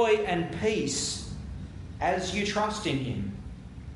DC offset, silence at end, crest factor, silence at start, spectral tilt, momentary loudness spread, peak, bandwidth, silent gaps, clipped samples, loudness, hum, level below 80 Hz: under 0.1%; 0 s; 18 dB; 0 s; -4 dB/octave; 15 LU; -12 dBFS; 11.5 kHz; none; under 0.1%; -29 LUFS; none; -46 dBFS